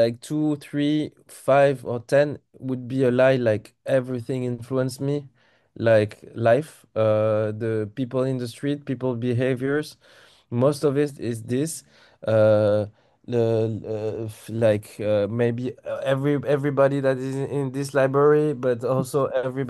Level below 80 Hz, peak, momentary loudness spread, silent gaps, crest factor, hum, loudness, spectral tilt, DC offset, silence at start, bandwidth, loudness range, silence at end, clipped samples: -64 dBFS; -6 dBFS; 11 LU; none; 16 dB; none; -23 LUFS; -7 dB/octave; under 0.1%; 0 s; 12.5 kHz; 3 LU; 0 s; under 0.1%